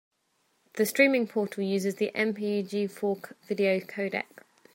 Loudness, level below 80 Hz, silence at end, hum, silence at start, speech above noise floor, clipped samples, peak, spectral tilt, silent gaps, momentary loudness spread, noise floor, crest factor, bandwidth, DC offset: -28 LUFS; -80 dBFS; 0.5 s; none; 0.75 s; 45 dB; under 0.1%; -8 dBFS; -5 dB/octave; none; 12 LU; -73 dBFS; 20 dB; 16 kHz; under 0.1%